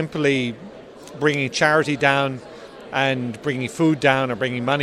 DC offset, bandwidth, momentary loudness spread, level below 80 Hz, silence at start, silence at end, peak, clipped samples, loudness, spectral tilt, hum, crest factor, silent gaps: under 0.1%; 13.5 kHz; 21 LU; -58 dBFS; 0 s; 0 s; 0 dBFS; under 0.1%; -20 LUFS; -5 dB/octave; none; 20 dB; none